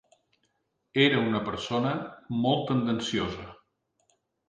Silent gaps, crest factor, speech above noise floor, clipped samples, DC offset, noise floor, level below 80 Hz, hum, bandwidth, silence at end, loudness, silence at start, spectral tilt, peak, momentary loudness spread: none; 22 dB; 49 dB; under 0.1%; under 0.1%; -76 dBFS; -58 dBFS; none; 9.4 kHz; 0.95 s; -27 LUFS; 0.95 s; -5.5 dB/octave; -8 dBFS; 12 LU